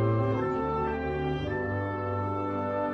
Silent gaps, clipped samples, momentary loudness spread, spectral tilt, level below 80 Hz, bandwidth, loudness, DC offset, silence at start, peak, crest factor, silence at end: none; under 0.1%; 4 LU; -9 dB/octave; -48 dBFS; 6.2 kHz; -30 LUFS; under 0.1%; 0 s; -16 dBFS; 14 dB; 0 s